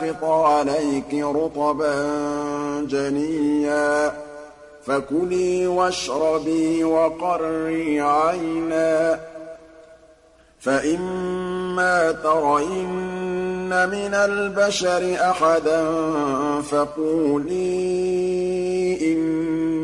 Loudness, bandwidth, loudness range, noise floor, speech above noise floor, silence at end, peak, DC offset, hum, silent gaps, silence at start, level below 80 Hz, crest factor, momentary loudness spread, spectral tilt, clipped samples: -21 LUFS; 11.5 kHz; 3 LU; -53 dBFS; 32 dB; 0 s; -8 dBFS; under 0.1%; none; none; 0 s; -52 dBFS; 14 dB; 7 LU; -5 dB/octave; under 0.1%